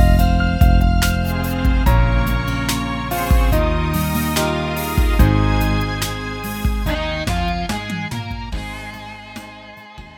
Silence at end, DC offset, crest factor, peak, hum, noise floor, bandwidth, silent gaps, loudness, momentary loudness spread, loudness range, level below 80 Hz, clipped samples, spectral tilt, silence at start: 0.05 s; under 0.1%; 16 dB; 0 dBFS; none; -38 dBFS; 18.5 kHz; none; -19 LUFS; 15 LU; 6 LU; -20 dBFS; under 0.1%; -5.5 dB/octave; 0 s